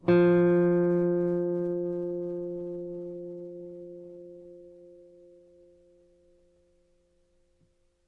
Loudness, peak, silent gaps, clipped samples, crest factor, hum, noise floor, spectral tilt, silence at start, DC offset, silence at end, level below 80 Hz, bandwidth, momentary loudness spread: -27 LUFS; -12 dBFS; none; under 0.1%; 18 dB; none; -68 dBFS; -10.5 dB/octave; 0.05 s; under 0.1%; 3.2 s; -66 dBFS; 4.5 kHz; 24 LU